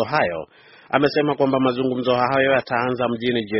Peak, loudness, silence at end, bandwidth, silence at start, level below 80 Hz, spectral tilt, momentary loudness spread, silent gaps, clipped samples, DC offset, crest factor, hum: 0 dBFS; -20 LUFS; 0 s; 6 kHz; 0 s; -56 dBFS; -4 dB/octave; 6 LU; none; under 0.1%; under 0.1%; 20 dB; none